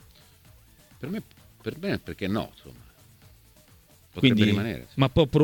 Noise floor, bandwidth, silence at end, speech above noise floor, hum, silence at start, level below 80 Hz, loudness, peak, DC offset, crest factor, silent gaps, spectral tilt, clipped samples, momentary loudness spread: -56 dBFS; 19 kHz; 0 s; 31 dB; none; 1 s; -48 dBFS; -26 LUFS; -4 dBFS; under 0.1%; 24 dB; none; -7 dB/octave; under 0.1%; 17 LU